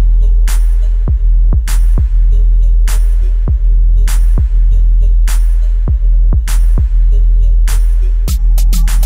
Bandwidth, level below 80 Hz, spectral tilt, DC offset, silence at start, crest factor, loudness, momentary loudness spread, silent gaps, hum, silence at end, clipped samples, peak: 15 kHz; -8 dBFS; -5.5 dB/octave; under 0.1%; 0 s; 6 dB; -14 LUFS; 2 LU; none; none; 0 s; under 0.1%; -2 dBFS